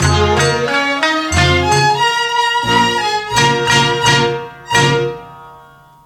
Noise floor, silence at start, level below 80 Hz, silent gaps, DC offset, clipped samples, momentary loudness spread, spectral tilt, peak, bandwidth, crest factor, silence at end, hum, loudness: -42 dBFS; 0 s; -34 dBFS; none; under 0.1%; under 0.1%; 5 LU; -3.5 dB/octave; 0 dBFS; 16.5 kHz; 14 dB; 0.5 s; none; -13 LUFS